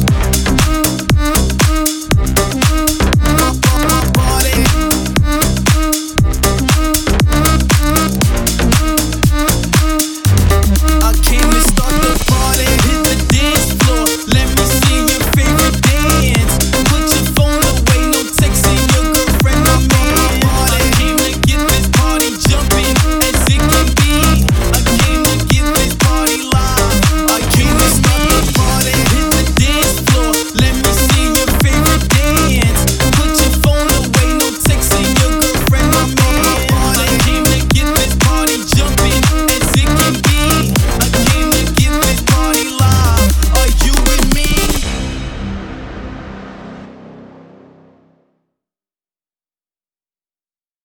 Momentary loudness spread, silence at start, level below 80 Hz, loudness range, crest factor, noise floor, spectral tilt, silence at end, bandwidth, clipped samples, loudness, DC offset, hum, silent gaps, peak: 3 LU; 0 s; -16 dBFS; 1 LU; 12 dB; under -90 dBFS; -4 dB/octave; 3.6 s; 19.5 kHz; under 0.1%; -12 LUFS; under 0.1%; none; none; 0 dBFS